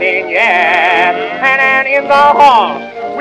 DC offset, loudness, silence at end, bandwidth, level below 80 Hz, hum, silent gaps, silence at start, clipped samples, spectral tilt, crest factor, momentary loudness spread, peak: under 0.1%; -9 LUFS; 0 s; 11 kHz; -52 dBFS; none; none; 0 s; 2%; -3.5 dB/octave; 10 dB; 8 LU; 0 dBFS